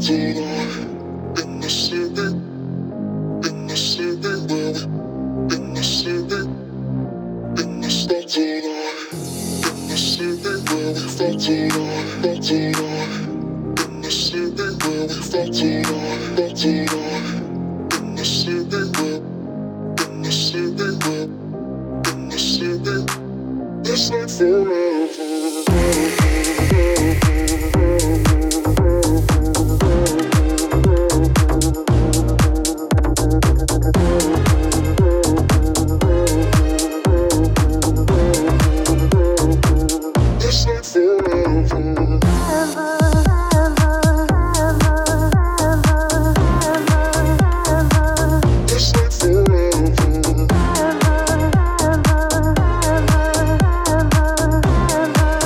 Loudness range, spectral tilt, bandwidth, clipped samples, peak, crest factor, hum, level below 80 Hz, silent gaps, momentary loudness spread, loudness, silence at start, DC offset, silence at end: 7 LU; -5 dB/octave; 17.5 kHz; under 0.1%; -4 dBFS; 12 dB; none; -22 dBFS; none; 9 LU; -18 LUFS; 0 s; under 0.1%; 0 s